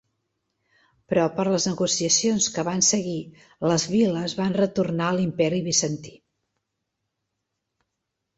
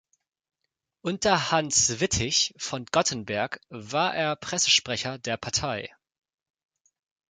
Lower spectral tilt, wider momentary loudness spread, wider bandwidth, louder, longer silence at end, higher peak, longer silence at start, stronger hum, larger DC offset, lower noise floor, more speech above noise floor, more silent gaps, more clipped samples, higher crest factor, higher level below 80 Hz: first, -4 dB/octave vs -2 dB/octave; second, 6 LU vs 12 LU; second, 8.2 kHz vs 11 kHz; about the same, -23 LUFS vs -25 LUFS; first, 2.25 s vs 1.4 s; about the same, -8 dBFS vs -6 dBFS; about the same, 1.1 s vs 1.05 s; neither; neither; about the same, -81 dBFS vs -83 dBFS; about the same, 58 dB vs 56 dB; neither; neither; about the same, 18 dB vs 22 dB; second, -62 dBFS vs -52 dBFS